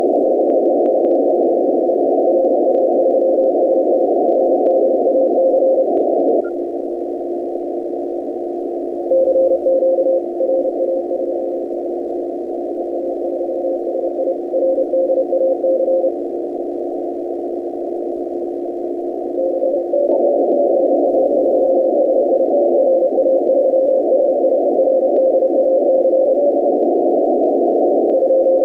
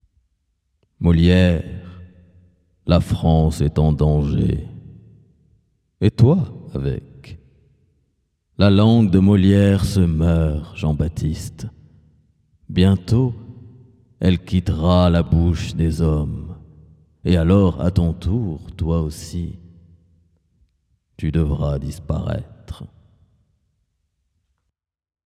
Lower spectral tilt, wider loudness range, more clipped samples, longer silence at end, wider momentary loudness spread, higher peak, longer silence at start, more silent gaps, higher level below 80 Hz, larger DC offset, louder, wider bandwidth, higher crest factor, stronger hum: about the same, -9 dB/octave vs -8 dB/octave; second, 7 LU vs 10 LU; neither; second, 0 s vs 2.4 s; second, 9 LU vs 18 LU; second, -6 dBFS vs 0 dBFS; second, 0 s vs 1 s; neither; second, -60 dBFS vs -32 dBFS; neither; about the same, -16 LUFS vs -18 LUFS; second, 2 kHz vs 13 kHz; second, 10 dB vs 20 dB; neither